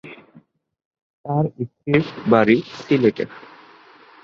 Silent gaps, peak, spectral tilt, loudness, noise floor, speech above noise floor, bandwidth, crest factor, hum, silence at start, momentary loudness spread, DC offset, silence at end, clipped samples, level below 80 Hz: 0.85-0.91 s, 1.02-1.24 s; -2 dBFS; -8 dB/octave; -20 LUFS; -53 dBFS; 34 dB; 7.2 kHz; 20 dB; none; 0.05 s; 15 LU; under 0.1%; 0.85 s; under 0.1%; -58 dBFS